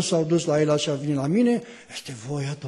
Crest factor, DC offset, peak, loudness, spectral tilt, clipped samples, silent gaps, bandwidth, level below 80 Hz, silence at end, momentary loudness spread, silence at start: 14 dB; under 0.1%; -10 dBFS; -23 LUFS; -5.5 dB/octave; under 0.1%; none; 12 kHz; -62 dBFS; 0 s; 14 LU; 0 s